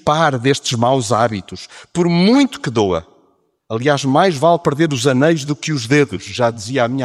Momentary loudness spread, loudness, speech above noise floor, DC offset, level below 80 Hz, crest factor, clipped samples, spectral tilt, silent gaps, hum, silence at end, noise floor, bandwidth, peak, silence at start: 7 LU; -16 LUFS; 44 dB; under 0.1%; -52 dBFS; 14 dB; under 0.1%; -5.5 dB/octave; none; none; 0 s; -59 dBFS; 14 kHz; -2 dBFS; 0.05 s